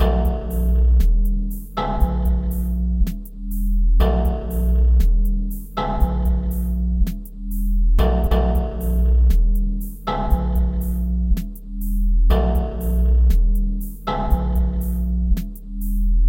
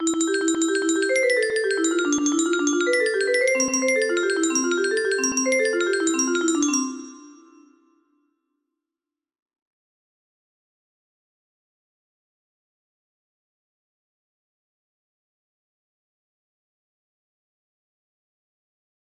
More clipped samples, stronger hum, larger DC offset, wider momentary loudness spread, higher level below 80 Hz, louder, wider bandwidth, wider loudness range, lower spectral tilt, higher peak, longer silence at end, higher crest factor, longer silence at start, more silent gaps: neither; neither; neither; first, 9 LU vs 2 LU; first, -18 dBFS vs -70 dBFS; about the same, -22 LUFS vs -21 LUFS; first, 17 kHz vs 15 kHz; second, 2 LU vs 6 LU; first, -8 dB/octave vs -0.5 dB/octave; about the same, -6 dBFS vs -8 dBFS; second, 0 s vs 11.7 s; about the same, 12 dB vs 16 dB; about the same, 0 s vs 0 s; neither